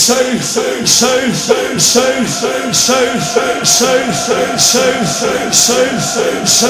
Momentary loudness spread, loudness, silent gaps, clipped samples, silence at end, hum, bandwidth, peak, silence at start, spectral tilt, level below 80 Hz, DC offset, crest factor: 5 LU; -11 LUFS; none; 0.2%; 0 s; none; over 20 kHz; 0 dBFS; 0 s; -2 dB/octave; -46 dBFS; under 0.1%; 12 dB